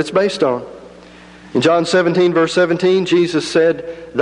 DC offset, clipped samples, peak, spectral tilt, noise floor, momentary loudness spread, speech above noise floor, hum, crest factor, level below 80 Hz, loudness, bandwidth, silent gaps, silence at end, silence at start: under 0.1%; under 0.1%; -2 dBFS; -5.5 dB/octave; -40 dBFS; 10 LU; 25 dB; none; 12 dB; -54 dBFS; -15 LUFS; 11 kHz; none; 0 s; 0 s